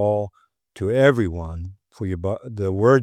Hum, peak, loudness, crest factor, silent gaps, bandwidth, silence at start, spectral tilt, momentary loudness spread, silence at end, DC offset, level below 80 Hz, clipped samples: none; -2 dBFS; -22 LUFS; 20 dB; none; 12.5 kHz; 0 s; -7.5 dB/octave; 16 LU; 0 s; under 0.1%; -48 dBFS; under 0.1%